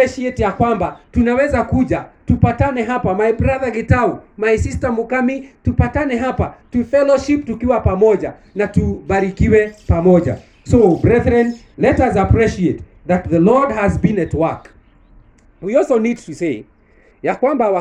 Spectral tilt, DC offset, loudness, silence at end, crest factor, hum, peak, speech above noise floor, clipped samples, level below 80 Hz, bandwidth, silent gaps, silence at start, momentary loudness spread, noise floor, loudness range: -8 dB/octave; under 0.1%; -16 LUFS; 0 s; 16 dB; none; 0 dBFS; 35 dB; under 0.1%; -32 dBFS; 9.8 kHz; none; 0 s; 9 LU; -50 dBFS; 4 LU